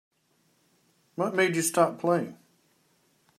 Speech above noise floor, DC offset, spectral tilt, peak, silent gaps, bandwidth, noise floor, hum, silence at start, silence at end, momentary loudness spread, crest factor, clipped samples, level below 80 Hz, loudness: 44 dB; under 0.1%; -4.5 dB/octave; -8 dBFS; none; 16 kHz; -69 dBFS; none; 1.2 s; 1.05 s; 13 LU; 22 dB; under 0.1%; -82 dBFS; -26 LUFS